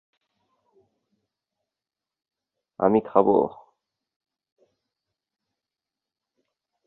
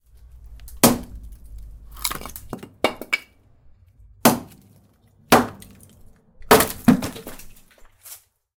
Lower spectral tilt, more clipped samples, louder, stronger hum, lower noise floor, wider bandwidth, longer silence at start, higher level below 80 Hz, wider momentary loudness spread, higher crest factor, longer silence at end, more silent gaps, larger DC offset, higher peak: first, -11.5 dB/octave vs -3.5 dB/octave; neither; about the same, -22 LUFS vs -20 LUFS; neither; first, -90 dBFS vs -56 dBFS; second, 4 kHz vs 19 kHz; first, 2.8 s vs 0.5 s; second, -70 dBFS vs -44 dBFS; second, 6 LU vs 25 LU; about the same, 26 dB vs 22 dB; first, 3.35 s vs 0.4 s; neither; neither; about the same, -4 dBFS vs -2 dBFS